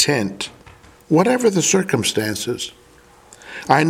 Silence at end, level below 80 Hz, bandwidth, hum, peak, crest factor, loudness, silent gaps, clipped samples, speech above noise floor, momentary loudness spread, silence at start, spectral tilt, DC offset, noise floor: 0 s; -56 dBFS; 16.5 kHz; none; 0 dBFS; 20 dB; -19 LUFS; none; under 0.1%; 30 dB; 15 LU; 0 s; -4 dB/octave; under 0.1%; -48 dBFS